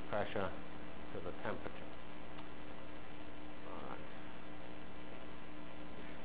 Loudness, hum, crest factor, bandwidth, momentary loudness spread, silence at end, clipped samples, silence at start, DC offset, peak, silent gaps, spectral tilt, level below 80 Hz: -48 LUFS; none; 24 dB; 4 kHz; 10 LU; 0 s; under 0.1%; 0 s; 1%; -26 dBFS; none; -4 dB/octave; -62 dBFS